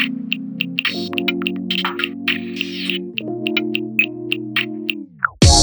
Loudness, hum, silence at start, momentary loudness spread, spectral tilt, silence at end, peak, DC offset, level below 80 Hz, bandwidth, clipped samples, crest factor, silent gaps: -20 LUFS; none; 0 s; 6 LU; -3.5 dB/octave; 0 s; 0 dBFS; under 0.1%; -30 dBFS; over 20 kHz; under 0.1%; 20 dB; none